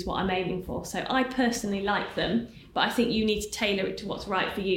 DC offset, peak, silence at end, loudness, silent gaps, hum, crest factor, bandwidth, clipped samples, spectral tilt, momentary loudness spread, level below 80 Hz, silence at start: under 0.1%; -12 dBFS; 0 s; -28 LUFS; none; none; 16 dB; 17 kHz; under 0.1%; -4.5 dB/octave; 7 LU; -48 dBFS; 0 s